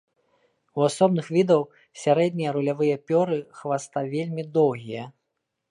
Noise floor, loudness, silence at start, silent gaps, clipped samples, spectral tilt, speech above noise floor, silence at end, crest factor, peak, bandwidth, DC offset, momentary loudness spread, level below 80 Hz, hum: -80 dBFS; -24 LUFS; 0.75 s; none; under 0.1%; -6.5 dB/octave; 56 dB; 0.6 s; 18 dB; -6 dBFS; 11.5 kHz; under 0.1%; 13 LU; -74 dBFS; none